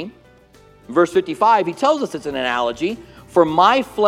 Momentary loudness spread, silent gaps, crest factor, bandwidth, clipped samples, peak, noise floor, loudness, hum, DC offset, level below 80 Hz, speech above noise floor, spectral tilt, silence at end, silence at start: 11 LU; none; 18 dB; 14 kHz; under 0.1%; 0 dBFS; -49 dBFS; -18 LUFS; none; under 0.1%; -54 dBFS; 32 dB; -5 dB/octave; 0 s; 0 s